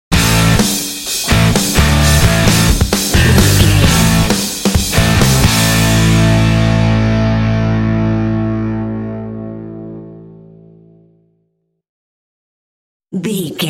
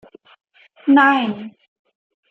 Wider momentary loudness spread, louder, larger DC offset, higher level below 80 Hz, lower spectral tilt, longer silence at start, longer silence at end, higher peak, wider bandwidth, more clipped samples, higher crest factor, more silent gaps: second, 13 LU vs 20 LU; first, -12 LUFS vs -16 LUFS; neither; first, -22 dBFS vs -74 dBFS; second, -4.5 dB/octave vs -6 dB/octave; second, 0.1 s vs 0.85 s; second, 0 s vs 0.8 s; about the same, 0 dBFS vs -2 dBFS; first, 17 kHz vs 5.8 kHz; neither; second, 12 dB vs 18 dB; first, 11.89-13.00 s vs none